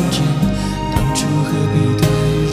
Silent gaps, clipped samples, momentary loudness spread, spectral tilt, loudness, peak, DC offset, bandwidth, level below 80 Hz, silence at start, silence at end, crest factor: none; under 0.1%; 3 LU; -6 dB/octave; -16 LUFS; -2 dBFS; under 0.1%; 15.5 kHz; -28 dBFS; 0 s; 0 s; 14 dB